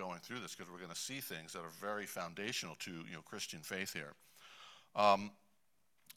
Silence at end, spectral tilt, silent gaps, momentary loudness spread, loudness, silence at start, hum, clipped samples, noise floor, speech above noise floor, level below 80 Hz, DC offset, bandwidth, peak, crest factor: 0.05 s; -3 dB/octave; none; 20 LU; -41 LUFS; 0 s; none; under 0.1%; -81 dBFS; 40 dB; -78 dBFS; under 0.1%; 16 kHz; -16 dBFS; 26 dB